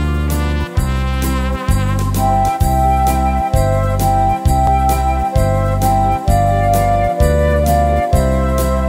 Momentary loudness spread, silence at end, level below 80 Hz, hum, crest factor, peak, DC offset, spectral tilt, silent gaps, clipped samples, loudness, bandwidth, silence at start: 4 LU; 0 s; -18 dBFS; none; 12 dB; 0 dBFS; under 0.1%; -6.5 dB/octave; none; under 0.1%; -15 LUFS; 16.5 kHz; 0 s